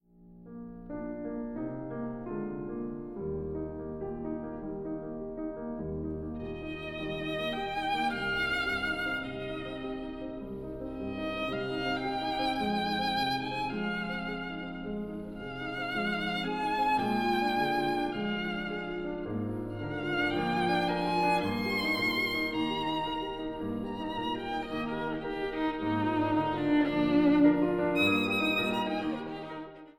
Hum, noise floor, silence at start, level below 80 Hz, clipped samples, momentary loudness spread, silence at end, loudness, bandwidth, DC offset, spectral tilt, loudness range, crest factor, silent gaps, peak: none; -53 dBFS; 0.2 s; -52 dBFS; under 0.1%; 11 LU; 0.1 s; -32 LUFS; 16 kHz; under 0.1%; -6 dB/octave; 10 LU; 20 dB; none; -12 dBFS